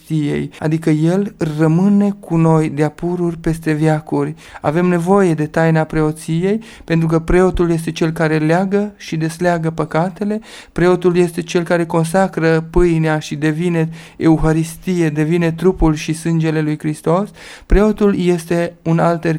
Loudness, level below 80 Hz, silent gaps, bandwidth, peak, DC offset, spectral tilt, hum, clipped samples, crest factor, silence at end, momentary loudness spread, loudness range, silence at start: -16 LUFS; -30 dBFS; none; 12.5 kHz; 0 dBFS; under 0.1%; -7 dB/octave; none; under 0.1%; 16 dB; 0 s; 7 LU; 1 LU; 0.1 s